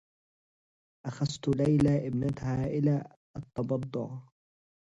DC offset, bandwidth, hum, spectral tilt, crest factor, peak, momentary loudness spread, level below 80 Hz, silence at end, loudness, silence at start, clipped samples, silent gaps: under 0.1%; 9.6 kHz; none; -8 dB/octave; 16 dB; -14 dBFS; 17 LU; -56 dBFS; 0.65 s; -30 LUFS; 1.05 s; under 0.1%; 3.17-3.34 s